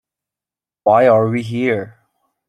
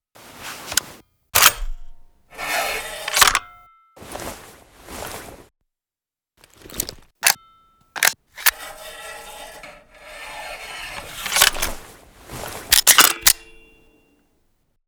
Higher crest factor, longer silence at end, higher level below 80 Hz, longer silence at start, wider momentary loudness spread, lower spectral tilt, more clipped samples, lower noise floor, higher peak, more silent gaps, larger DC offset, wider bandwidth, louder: second, 16 dB vs 24 dB; second, 0.6 s vs 1.5 s; second, -60 dBFS vs -40 dBFS; first, 0.85 s vs 0.25 s; second, 11 LU vs 23 LU; first, -8 dB/octave vs 1 dB/octave; neither; about the same, -90 dBFS vs under -90 dBFS; about the same, -2 dBFS vs 0 dBFS; neither; neither; second, 11.5 kHz vs over 20 kHz; about the same, -15 LUFS vs -17 LUFS